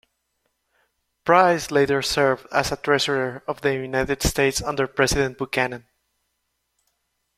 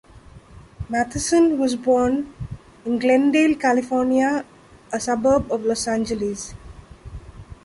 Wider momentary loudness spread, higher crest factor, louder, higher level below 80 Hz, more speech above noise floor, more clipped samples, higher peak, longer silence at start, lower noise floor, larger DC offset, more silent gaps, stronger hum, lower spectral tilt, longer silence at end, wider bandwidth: second, 8 LU vs 18 LU; first, 22 dB vs 14 dB; about the same, -21 LUFS vs -20 LUFS; about the same, -42 dBFS vs -44 dBFS; first, 54 dB vs 26 dB; neither; first, -2 dBFS vs -6 dBFS; first, 1.25 s vs 0.15 s; first, -75 dBFS vs -45 dBFS; neither; neither; first, 60 Hz at -60 dBFS vs none; about the same, -4 dB/octave vs -4.5 dB/octave; first, 1.6 s vs 0.1 s; first, 16 kHz vs 11.5 kHz